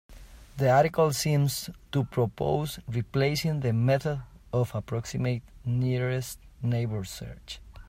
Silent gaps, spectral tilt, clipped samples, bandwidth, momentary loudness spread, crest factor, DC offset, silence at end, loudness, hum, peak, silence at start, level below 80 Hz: none; -6 dB/octave; under 0.1%; 16 kHz; 13 LU; 18 dB; under 0.1%; 0 s; -28 LUFS; none; -10 dBFS; 0.1 s; -50 dBFS